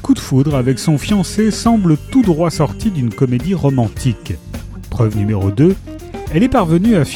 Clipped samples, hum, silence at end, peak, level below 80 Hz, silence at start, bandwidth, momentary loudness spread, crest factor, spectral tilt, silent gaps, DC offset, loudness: under 0.1%; none; 0 s; 0 dBFS; -32 dBFS; 0 s; 18 kHz; 13 LU; 14 dB; -7 dB/octave; none; under 0.1%; -15 LUFS